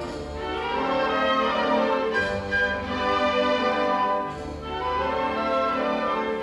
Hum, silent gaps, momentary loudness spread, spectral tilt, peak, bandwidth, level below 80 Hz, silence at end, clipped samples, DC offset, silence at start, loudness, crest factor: none; none; 8 LU; -5 dB/octave; -10 dBFS; 11 kHz; -46 dBFS; 0 s; under 0.1%; under 0.1%; 0 s; -24 LUFS; 14 dB